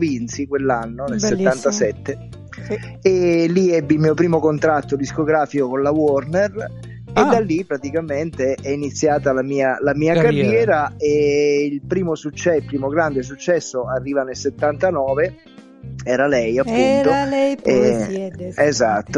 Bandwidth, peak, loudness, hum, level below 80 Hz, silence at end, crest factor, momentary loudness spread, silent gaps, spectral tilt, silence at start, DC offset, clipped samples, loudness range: 11 kHz; -2 dBFS; -18 LUFS; none; -46 dBFS; 0 s; 16 dB; 9 LU; none; -6 dB/octave; 0 s; under 0.1%; under 0.1%; 3 LU